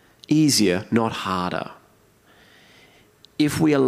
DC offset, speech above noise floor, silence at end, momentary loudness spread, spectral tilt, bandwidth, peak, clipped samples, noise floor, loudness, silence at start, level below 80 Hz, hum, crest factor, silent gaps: under 0.1%; 37 dB; 0 s; 13 LU; -4.5 dB/octave; 16 kHz; -6 dBFS; under 0.1%; -56 dBFS; -21 LUFS; 0.3 s; -60 dBFS; none; 16 dB; none